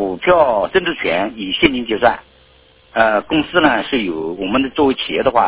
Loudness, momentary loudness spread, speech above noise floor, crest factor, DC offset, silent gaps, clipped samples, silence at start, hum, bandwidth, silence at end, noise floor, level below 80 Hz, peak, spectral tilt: -16 LUFS; 7 LU; 34 dB; 16 dB; under 0.1%; none; under 0.1%; 0 s; none; 4 kHz; 0 s; -49 dBFS; -44 dBFS; 0 dBFS; -8.5 dB/octave